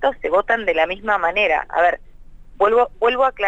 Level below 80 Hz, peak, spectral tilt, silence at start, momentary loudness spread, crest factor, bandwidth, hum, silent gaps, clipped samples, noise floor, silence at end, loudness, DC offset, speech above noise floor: -44 dBFS; -6 dBFS; -4.5 dB/octave; 0 s; 3 LU; 14 dB; 7.8 kHz; none; none; under 0.1%; -40 dBFS; 0 s; -18 LUFS; under 0.1%; 22 dB